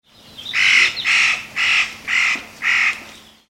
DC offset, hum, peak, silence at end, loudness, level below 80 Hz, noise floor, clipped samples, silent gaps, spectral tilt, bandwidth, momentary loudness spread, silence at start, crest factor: under 0.1%; none; -2 dBFS; 0.35 s; -15 LUFS; -58 dBFS; -41 dBFS; under 0.1%; none; 1 dB/octave; 16.5 kHz; 8 LU; 0.35 s; 16 dB